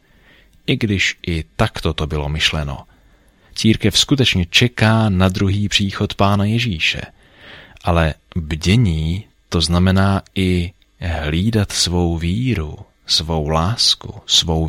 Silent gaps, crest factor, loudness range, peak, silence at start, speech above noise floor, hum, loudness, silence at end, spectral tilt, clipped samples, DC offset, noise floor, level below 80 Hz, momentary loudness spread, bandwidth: none; 16 dB; 4 LU; 0 dBFS; 0.7 s; 35 dB; none; -17 LUFS; 0 s; -4.5 dB/octave; under 0.1%; under 0.1%; -52 dBFS; -32 dBFS; 11 LU; 16 kHz